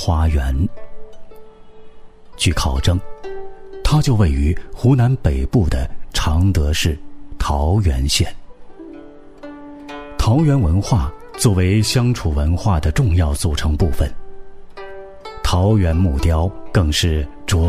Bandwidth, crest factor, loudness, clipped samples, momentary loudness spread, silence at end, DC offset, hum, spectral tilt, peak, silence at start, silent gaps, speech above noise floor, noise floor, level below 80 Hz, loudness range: 15.5 kHz; 16 dB; -18 LUFS; under 0.1%; 20 LU; 0 s; under 0.1%; none; -5.5 dB/octave; 0 dBFS; 0 s; none; 22 dB; -37 dBFS; -24 dBFS; 5 LU